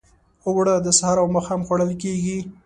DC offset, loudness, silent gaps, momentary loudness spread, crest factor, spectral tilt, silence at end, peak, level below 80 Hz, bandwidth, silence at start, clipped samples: under 0.1%; -20 LUFS; none; 9 LU; 18 dB; -4.5 dB/octave; 0.15 s; -2 dBFS; -50 dBFS; 11.5 kHz; 0.45 s; under 0.1%